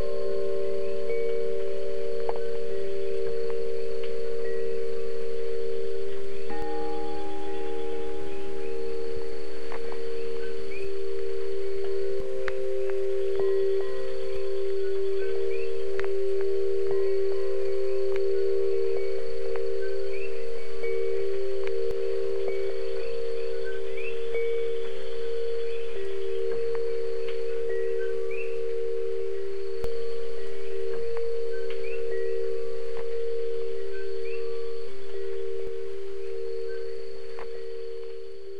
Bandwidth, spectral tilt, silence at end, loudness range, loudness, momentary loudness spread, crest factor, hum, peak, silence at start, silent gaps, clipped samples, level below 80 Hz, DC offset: 11.5 kHz; -6.5 dB/octave; 0 s; 6 LU; -31 LUFS; 8 LU; 18 dB; none; -10 dBFS; 0 s; none; under 0.1%; -54 dBFS; 10%